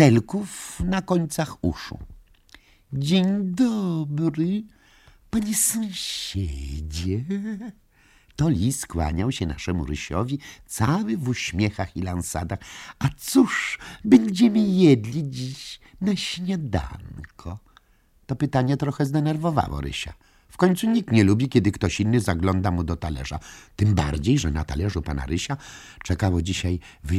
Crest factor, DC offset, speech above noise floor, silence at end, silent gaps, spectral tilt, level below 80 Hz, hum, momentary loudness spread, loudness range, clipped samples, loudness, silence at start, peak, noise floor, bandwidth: 20 dB; under 0.1%; 37 dB; 0 s; none; -5.5 dB/octave; -40 dBFS; none; 15 LU; 6 LU; under 0.1%; -24 LUFS; 0 s; -4 dBFS; -60 dBFS; 16 kHz